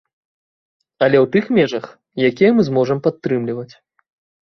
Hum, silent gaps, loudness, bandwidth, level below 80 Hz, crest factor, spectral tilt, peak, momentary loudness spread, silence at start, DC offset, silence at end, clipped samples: none; none; -17 LUFS; 6.4 kHz; -58 dBFS; 16 dB; -7.5 dB/octave; -2 dBFS; 14 LU; 1 s; under 0.1%; 0.75 s; under 0.1%